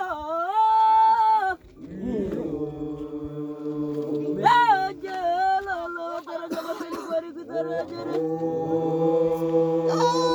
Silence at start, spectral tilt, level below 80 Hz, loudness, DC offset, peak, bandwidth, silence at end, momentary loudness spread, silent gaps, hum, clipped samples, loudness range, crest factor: 0 s; -6 dB/octave; -56 dBFS; -24 LUFS; under 0.1%; -6 dBFS; over 20 kHz; 0 s; 14 LU; none; none; under 0.1%; 6 LU; 18 dB